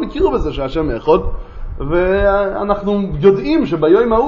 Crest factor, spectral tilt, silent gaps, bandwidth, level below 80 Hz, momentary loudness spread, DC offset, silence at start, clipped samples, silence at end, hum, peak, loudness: 14 dB; -8.5 dB/octave; none; 6.8 kHz; -26 dBFS; 9 LU; under 0.1%; 0 s; under 0.1%; 0 s; none; 0 dBFS; -15 LUFS